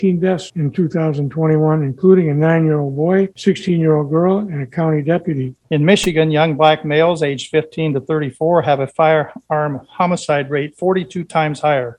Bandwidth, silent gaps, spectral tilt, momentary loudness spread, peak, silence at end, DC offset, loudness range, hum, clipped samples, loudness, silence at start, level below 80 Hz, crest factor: 10.5 kHz; none; -7 dB/octave; 7 LU; 0 dBFS; 0.05 s; under 0.1%; 2 LU; none; under 0.1%; -16 LUFS; 0 s; -52 dBFS; 16 dB